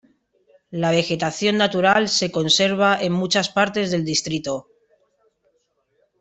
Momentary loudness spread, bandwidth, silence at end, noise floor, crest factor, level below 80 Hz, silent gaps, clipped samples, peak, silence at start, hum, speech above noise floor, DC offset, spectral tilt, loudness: 9 LU; 8.4 kHz; 1.6 s; -68 dBFS; 18 dB; -60 dBFS; none; under 0.1%; -4 dBFS; 0.7 s; none; 48 dB; under 0.1%; -3.5 dB/octave; -19 LUFS